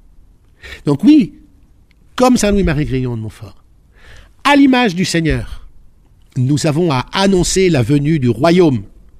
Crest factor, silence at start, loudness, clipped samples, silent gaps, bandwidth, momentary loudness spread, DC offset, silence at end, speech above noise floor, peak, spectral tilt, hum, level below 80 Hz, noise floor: 14 dB; 0.65 s; -13 LUFS; under 0.1%; none; 15 kHz; 13 LU; under 0.1%; 0.35 s; 34 dB; 0 dBFS; -5.5 dB/octave; none; -32 dBFS; -47 dBFS